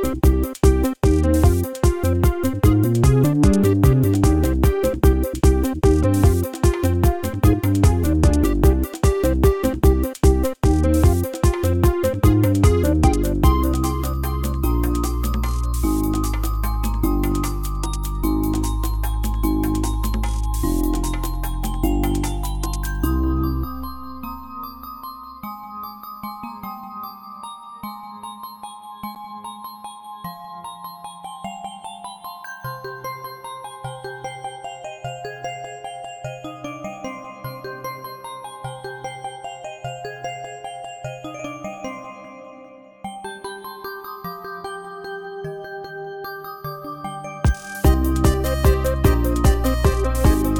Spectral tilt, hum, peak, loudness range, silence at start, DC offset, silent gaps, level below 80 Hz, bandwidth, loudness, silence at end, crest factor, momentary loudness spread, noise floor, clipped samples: -6.5 dB/octave; none; -2 dBFS; 16 LU; 0 s; under 0.1%; none; -24 dBFS; 18.5 kHz; -20 LUFS; 0 s; 18 dB; 17 LU; -43 dBFS; under 0.1%